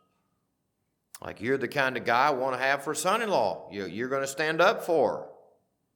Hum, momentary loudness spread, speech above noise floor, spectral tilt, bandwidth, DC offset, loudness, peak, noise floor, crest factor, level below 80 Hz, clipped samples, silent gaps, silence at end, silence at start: none; 12 LU; 51 dB; -3.5 dB/octave; 19 kHz; under 0.1%; -27 LUFS; -8 dBFS; -78 dBFS; 20 dB; -74 dBFS; under 0.1%; none; 0.65 s; 1.15 s